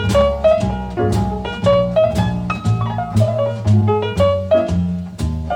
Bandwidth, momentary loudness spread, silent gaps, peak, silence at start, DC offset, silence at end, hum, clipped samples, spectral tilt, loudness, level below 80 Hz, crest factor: 12 kHz; 7 LU; none; -2 dBFS; 0 s; under 0.1%; 0 s; none; under 0.1%; -7.5 dB/octave; -17 LUFS; -30 dBFS; 14 dB